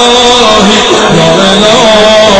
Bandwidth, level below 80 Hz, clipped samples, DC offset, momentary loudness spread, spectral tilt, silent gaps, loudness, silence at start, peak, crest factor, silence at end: 11 kHz; -30 dBFS; 10%; 2%; 2 LU; -3.5 dB/octave; none; -3 LUFS; 0 s; 0 dBFS; 4 dB; 0 s